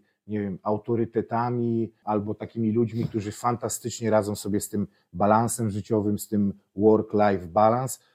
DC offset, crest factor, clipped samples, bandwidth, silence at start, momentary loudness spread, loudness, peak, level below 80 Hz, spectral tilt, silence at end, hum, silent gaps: under 0.1%; 18 dB; under 0.1%; 16 kHz; 0.3 s; 8 LU; -26 LUFS; -6 dBFS; -62 dBFS; -6.5 dB/octave; 0.2 s; none; none